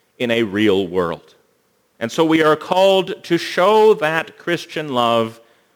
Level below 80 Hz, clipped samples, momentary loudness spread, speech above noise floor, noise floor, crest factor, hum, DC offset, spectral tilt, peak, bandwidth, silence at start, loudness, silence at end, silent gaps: -62 dBFS; under 0.1%; 10 LU; 45 dB; -62 dBFS; 16 dB; none; under 0.1%; -5 dB/octave; -2 dBFS; 20 kHz; 0.2 s; -17 LUFS; 0.4 s; none